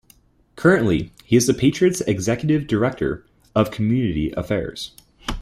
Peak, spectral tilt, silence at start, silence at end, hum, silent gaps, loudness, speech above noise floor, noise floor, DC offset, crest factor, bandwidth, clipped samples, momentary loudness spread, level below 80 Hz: -2 dBFS; -5.5 dB/octave; 0.55 s; 0 s; none; none; -20 LUFS; 36 dB; -55 dBFS; under 0.1%; 18 dB; 15.5 kHz; under 0.1%; 14 LU; -42 dBFS